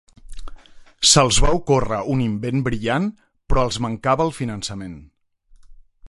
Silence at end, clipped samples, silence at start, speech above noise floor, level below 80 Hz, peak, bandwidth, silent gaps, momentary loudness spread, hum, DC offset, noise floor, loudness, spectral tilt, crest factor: 0.35 s; under 0.1%; 0.3 s; 32 dB; -32 dBFS; -2 dBFS; 11.5 kHz; none; 14 LU; none; under 0.1%; -51 dBFS; -19 LUFS; -4 dB/octave; 20 dB